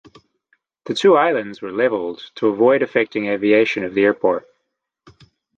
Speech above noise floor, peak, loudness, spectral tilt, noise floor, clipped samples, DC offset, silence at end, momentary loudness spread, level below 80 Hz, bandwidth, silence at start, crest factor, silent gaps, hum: 58 dB; -2 dBFS; -18 LUFS; -5.5 dB/octave; -75 dBFS; under 0.1%; under 0.1%; 1.2 s; 11 LU; -64 dBFS; 9 kHz; 0.85 s; 16 dB; none; none